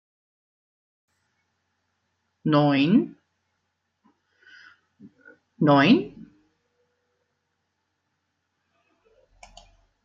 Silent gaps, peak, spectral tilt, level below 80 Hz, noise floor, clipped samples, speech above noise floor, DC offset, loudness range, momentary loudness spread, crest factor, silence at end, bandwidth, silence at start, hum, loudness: none; -6 dBFS; -5 dB/octave; -68 dBFS; -77 dBFS; under 0.1%; 58 dB; under 0.1%; 1 LU; 15 LU; 22 dB; 3.95 s; 7.2 kHz; 2.45 s; none; -21 LUFS